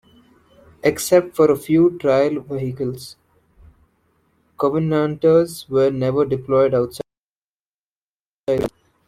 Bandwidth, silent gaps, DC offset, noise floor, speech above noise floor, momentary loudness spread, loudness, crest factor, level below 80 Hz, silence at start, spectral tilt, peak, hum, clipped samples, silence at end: 16 kHz; 7.18-8.44 s; under 0.1%; under -90 dBFS; over 72 dB; 12 LU; -19 LUFS; 18 dB; -54 dBFS; 0.85 s; -6.5 dB/octave; -2 dBFS; none; under 0.1%; 0.4 s